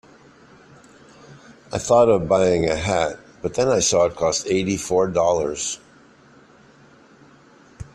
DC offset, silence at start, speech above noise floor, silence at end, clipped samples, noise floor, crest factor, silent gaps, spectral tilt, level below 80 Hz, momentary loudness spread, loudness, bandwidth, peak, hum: under 0.1%; 1.3 s; 31 dB; 0.1 s; under 0.1%; -51 dBFS; 18 dB; none; -4 dB/octave; -50 dBFS; 12 LU; -20 LUFS; 13 kHz; -4 dBFS; none